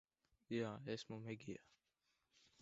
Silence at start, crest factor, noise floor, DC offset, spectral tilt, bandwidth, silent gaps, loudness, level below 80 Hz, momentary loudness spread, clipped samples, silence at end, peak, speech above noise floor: 0.5 s; 20 dB; -87 dBFS; under 0.1%; -5.5 dB/octave; 7.6 kHz; none; -49 LUFS; -84 dBFS; 9 LU; under 0.1%; 1 s; -32 dBFS; 39 dB